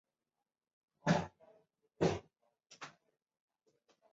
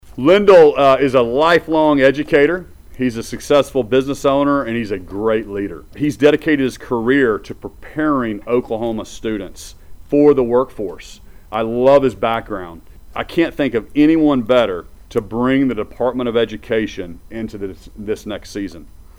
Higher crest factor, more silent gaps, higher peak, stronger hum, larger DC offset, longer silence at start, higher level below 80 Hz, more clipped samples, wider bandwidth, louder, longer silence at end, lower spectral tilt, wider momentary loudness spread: first, 24 dB vs 14 dB; neither; second, -18 dBFS vs -2 dBFS; neither; neither; first, 1.05 s vs 0.05 s; second, -66 dBFS vs -42 dBFS; neither; second, 7.6 kHz vs 15.5 kHz; second, -37 LUFS vs -16 LUFS; first, 1.25 s vs 0.3 s; about the same, -5.5 dB/octave vs -6 dB/octave; about the same, 18 LU vs 16 LU